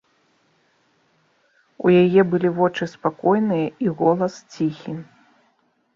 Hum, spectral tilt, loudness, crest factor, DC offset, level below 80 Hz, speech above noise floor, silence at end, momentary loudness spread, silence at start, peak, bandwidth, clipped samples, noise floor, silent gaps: none; -8 dB/octave; -20 LUFS; 18 dB; under 0.1%; -64 dBFS; 46 dB; 0.95 s; 11 LU; 1.8 s; -4 dBFS; 7.4 kHz; under 0.1%; -65 dBFS; none